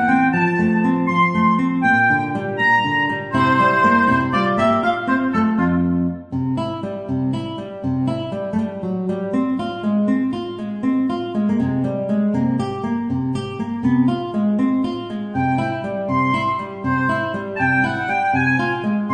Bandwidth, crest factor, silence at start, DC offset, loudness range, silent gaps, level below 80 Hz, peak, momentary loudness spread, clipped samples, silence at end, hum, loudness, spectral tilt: 9.4 kHz; 14 dB; 0 s; under 0.1%; 6 LU; none; -52 dBFS; -4 dBFS; 9 LU; under 0.1%; 0 s; none; -19 LUFS; -7.5 dB/octave